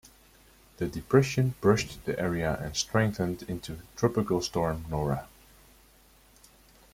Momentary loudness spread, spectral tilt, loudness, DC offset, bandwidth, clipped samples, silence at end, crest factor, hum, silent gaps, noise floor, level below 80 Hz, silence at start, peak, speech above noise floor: 11 LU; -5.5 dB/octave; -29 LUFS; under 0.1%; 16.5 kHz; under 0.1%; 1.65 s; 22 dB; none; none; -59 dBFS; -50 dBFS; 0.8 s; -8 dBFS; 31 dB